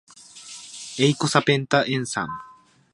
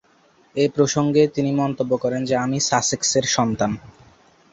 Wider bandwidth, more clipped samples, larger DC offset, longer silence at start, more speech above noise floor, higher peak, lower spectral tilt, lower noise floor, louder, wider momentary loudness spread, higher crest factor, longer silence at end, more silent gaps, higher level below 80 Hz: first, 11.5 kHz vs 8.4 kHz; neither; neither; second, 0.35 s vs 0.55 s; second, 22 dB vs 37 dB; about the same, -2 dBFS vs -2 dBFS; about the same, -4.5 dB/octave vs -4 dB/octave; second, -43 dBFS vs -57 dBFS; about the same, -22 LUFS vs -20 LUFS; first, 19 LU vs 5 LU; about the same, 22 dB vs 18 dB; second, 0.4 s vs 0.65 s; neither; second, -64 dBFS vs -54 dBFS